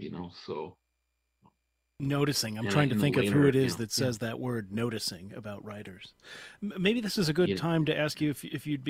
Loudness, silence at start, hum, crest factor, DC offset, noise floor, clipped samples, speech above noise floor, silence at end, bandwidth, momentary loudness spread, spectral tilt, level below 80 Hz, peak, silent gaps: -29 LUFS; 0 s; none; 20 dB; under 0.1%; -80 dBFS; under 0.1%; 50 dB; 0 s; 16 kHz; 18 LU; -5.5 dB/octave; -62 dBFS; -10 dBFS; none